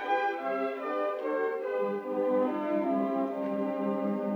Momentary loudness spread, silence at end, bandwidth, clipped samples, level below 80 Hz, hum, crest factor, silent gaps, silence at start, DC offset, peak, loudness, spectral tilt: 3 LU; 0 s; 6.8 kHz; under 0.1%; under -90 dBFS; none; 12 dB; none; 0 s; under 0.1%; -18 dBFS; -31 LUFS; -8 dB/octave